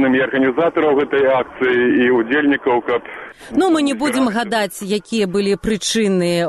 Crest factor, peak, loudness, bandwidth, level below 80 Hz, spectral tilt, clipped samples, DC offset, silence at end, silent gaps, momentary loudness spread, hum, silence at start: 10 dB; -6 dBFS; -17 LUFS; 12.5 kHz; -48 dBFS; -4.5 dB/octave; under 0.1%; under 0.1%; 0 s; none; 6 LU; none; 0 s